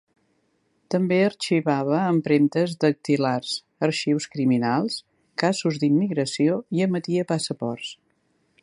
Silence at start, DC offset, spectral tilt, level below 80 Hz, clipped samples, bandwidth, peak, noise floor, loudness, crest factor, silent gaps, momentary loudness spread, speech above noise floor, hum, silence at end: 0.9 s; under 0.1%; -6 dB/octave; -70 dBFS; under 0.1%; 11.5 kHz; -6 dBFS; -68 dBFS; -23 LUFS; 16 dB; none; 8 LU; 46 dB; none; 0.7 s